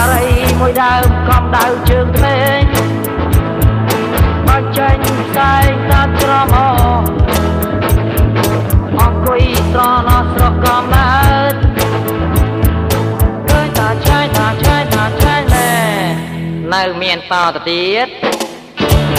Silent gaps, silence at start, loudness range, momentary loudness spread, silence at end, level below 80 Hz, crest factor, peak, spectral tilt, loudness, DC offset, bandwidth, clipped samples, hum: none; 0 s; 2 LU; 4 LU; 0 s; -18 dBFS; 12 dB; 0 dBFS; -5.5 dB/octave; -12 LUFS; under 0.1%; 16 kHz; under 0.1%; none